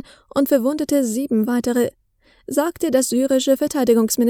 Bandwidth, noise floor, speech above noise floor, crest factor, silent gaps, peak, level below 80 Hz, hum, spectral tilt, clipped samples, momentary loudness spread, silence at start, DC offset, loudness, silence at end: over 20 kHz; -42 dBFS; 24 dB; 16 dB; none; -4 dBFS; -56 dBFS; none; -4 dB/octave; under 0.1%; 5 LU; 0.35 s; under 0.1%; -19 LUFS; 0 s